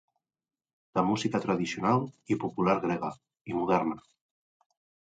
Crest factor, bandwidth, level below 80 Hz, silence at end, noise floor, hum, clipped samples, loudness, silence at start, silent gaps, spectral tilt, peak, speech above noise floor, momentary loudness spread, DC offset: 20 dB; 9.2 kHz; -66 dBFS; 1.1 s; under -90 dBFS; none; under 0.1%; -30 LUFS; 0.95 s; 3.41-3.45 s; -6.5 dB/octave; -10 dBFS; over 61 dB; 9 LU; under 0.1%